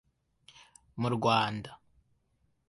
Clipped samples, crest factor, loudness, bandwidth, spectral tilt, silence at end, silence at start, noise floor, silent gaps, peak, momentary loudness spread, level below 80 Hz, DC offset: under 0.1%; 22 dB; -30 LUFS; 11.5 kHz; -6 dB/octave; 0.95 s; 0.95 s; -74 dBFS; none; -12 dBFS; 22 LU; -66 dBFS; under 0.1%